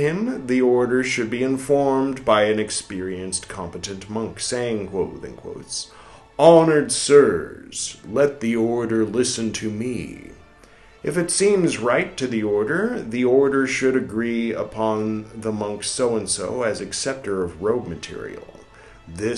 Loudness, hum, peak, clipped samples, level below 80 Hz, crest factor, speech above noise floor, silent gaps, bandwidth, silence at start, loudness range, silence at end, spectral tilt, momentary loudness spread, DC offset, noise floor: -21 LUFS; none; 0 dBFS; under 0.1%; -54 dBFS; 22 dB; 28 dB; none; 12 kHz; 0 s; 7 LU; 0 s; -4.5 dB/octave; 14 LU; under 0.1%; -49 dBFS